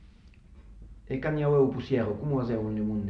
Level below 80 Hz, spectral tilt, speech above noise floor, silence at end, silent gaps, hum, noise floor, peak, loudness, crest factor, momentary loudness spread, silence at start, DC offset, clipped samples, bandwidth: -50 dBFS; -10 dB/octave; 26 dB; 0 s; none; none; -53 dBFS; -14 dBFS; -28 LUFS; 16 dB; 7 LU; 0 s; under 0.1%; under 0.1%; 6.2 kHz